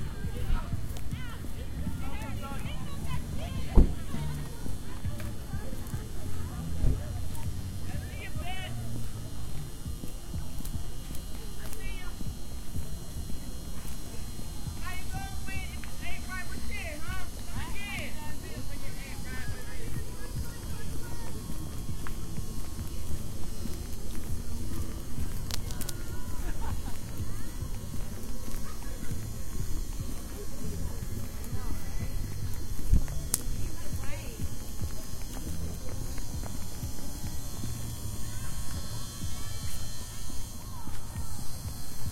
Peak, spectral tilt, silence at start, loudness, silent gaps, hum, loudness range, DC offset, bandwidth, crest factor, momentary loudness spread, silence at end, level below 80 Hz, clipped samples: -2 dBFS; -4.5 dB/octave; 0 s; -38 LUFS; none; none; 6 LU; under 0.1%; 16 kHz; 28 dB; 5 LU; 0 s; -36 dBFS; under 0.1%